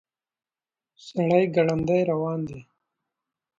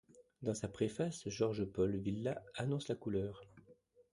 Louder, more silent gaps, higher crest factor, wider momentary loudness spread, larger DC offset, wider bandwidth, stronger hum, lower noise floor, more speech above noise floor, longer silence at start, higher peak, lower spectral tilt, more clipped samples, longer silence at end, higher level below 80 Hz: first, -24 LUFS vs -40 LUFS; neither; about the same, 20 dB vs 18 dB; first, 14 LU vs 5 LU; neither; second, 7.6 kHz vs 11.5 kHz; neither; first, under -90 dBFS vs -67 dBFS; first, over 67 dB vs 28 dB; first, 1.05 s vs 0.15 s; first, -8 dBFS vs -22 dBFS; first, -8 dB/octave vs -6.5 dB/octave; neither; first, 1 s vs 0.4 s; first, -58 dBFS vs -64 dBFS